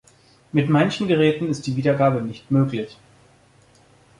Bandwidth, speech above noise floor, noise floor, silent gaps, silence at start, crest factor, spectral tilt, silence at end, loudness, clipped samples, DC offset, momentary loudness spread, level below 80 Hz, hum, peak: 11 kHz; 35 dB; -54 dBFS; none; 0.55 s; 16 dB; -7 dB/octave; 1.25 s; -21 LUFS; under 0.1%; under 0.1%; 7 LU; -58 dBFS; none; -6 dBFS